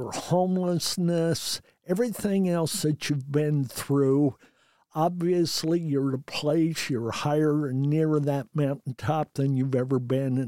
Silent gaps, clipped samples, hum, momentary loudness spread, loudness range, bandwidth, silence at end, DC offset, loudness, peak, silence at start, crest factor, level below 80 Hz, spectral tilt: none; under 0.1%; none; 5 LU; 1 LU; 16.5 kHz; 0 s; under 0.1%; -26 LUFS; -10 dBFS; 0 s; 14 dB; -64 dBFS; -6 dB/octave